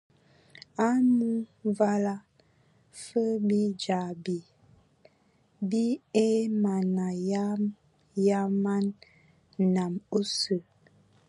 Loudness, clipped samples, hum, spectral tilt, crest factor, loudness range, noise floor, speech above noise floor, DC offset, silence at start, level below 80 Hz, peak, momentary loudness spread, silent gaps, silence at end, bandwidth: -28 LUFS; under 0.1%; none; -6.5 dB/octave; 18 dB; 3 LU; -66 dBFS; 39 dB; under 0.1%; 0.8 s; -74 dBFS; -10 dBFS; 9 LU; none; 0.7 s; 11 kHz